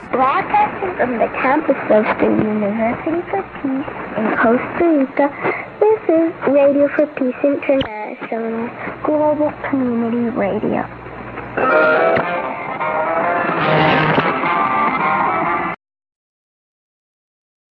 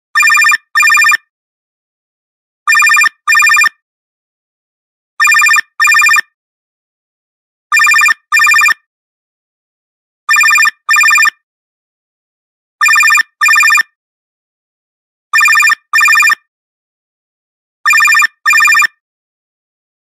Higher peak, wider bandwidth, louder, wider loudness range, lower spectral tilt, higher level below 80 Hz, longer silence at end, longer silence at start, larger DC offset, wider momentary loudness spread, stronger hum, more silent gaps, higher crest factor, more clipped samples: about the same, 0 dBFS vs 0 dBFS; second, 5.8 kHz vs 16 kHz; second, -17 LUFS vs -7 LUFS; about the same, 4 LU vs 2 LU; first, -9 dB/octave vs 4 dB/octave; first, -50 dBFS vs -78 dBFS; first, 2.05 s vs 1.25 s; second, 0 s vs 0.15 s; neither; first, 10 LU vs 7 LU; neither; second, none vs 1.30-2.66 s, 3.82-5.17 s, 6.34-7.70 s, 8.86-10.27 s, 11.43-12.79 s, 13.95-15.30 s, 16.48-17.84 s; about the same, 16 dB vs 12 dB; neither